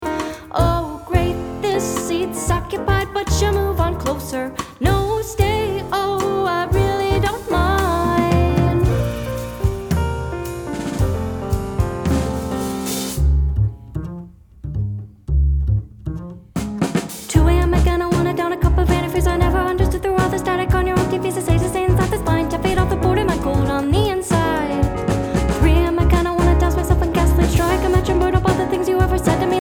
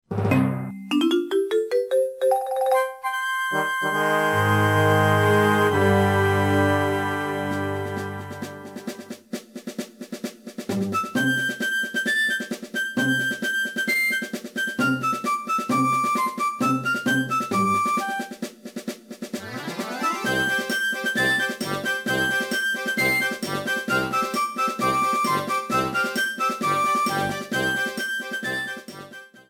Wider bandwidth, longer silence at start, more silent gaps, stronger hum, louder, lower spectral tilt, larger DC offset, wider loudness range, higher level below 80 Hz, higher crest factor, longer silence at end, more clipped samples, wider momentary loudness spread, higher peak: about the same, 19.5 kHz vs 18 kHz; about the same, 0 s vs 0.1 s; neither; neither; first, -19 LUFS vs -23 LUFS; first, -6 dB/octave vs -4.5 dB/octave; neither; about the same, 5 LU vs 7 LU; first, -24 dBFS vs -60 dBFS; about the same, 16 dB vs 18 dB; about the same, 0 s vs 0.1 s; neither; second, 9 LU vs 15 LU; first, -2 dBFS vs -6 dBFS